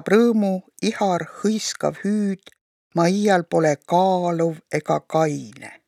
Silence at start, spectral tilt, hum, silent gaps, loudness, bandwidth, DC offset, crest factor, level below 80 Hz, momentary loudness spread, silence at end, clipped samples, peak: 0.05 s; -5.5 dB/octave; none; 2.61-2.91 s; -21 LUFS; 13.5 kHz; under 0.1%; 16 dB; -68 dBFS; 9 LU; 0.15 s; under 0.1%; -4 dBFS